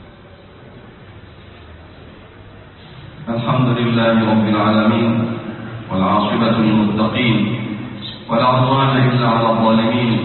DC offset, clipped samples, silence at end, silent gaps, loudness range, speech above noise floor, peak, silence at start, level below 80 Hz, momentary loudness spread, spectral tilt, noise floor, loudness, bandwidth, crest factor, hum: under 0.1%; under 0.1%; 0 s; none; 6 LU; 26 dB; -2 dBFS; 0 s; -46 dBFS; 13 LU; -12 dB/octave; -41 dBFS; -16 LUFS; 4.3 kHz; 14 dB; none